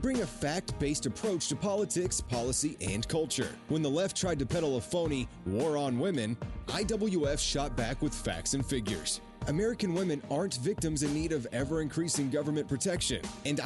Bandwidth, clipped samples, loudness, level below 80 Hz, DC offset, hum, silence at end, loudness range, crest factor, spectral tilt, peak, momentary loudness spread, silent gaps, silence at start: 11.5 kHz; under 0.1%; -32 LUFS; -46 dBFS; under 0.1%; none; 0 s; 1 LU; 12 dB; -4.5 dB/octave; -20 dBFS; 4 LU; none; 0 s